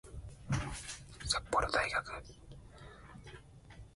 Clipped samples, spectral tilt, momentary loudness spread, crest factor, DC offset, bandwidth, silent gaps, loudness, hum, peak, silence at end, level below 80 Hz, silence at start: under 0.1%; -3.5 dB/octave; 23 LU; 24 dB; under 0.1%; 11.5 kHz; none; -36 LUFS; none; -16 dBFS; 0.05 s; -52 dBFS; 0.05 s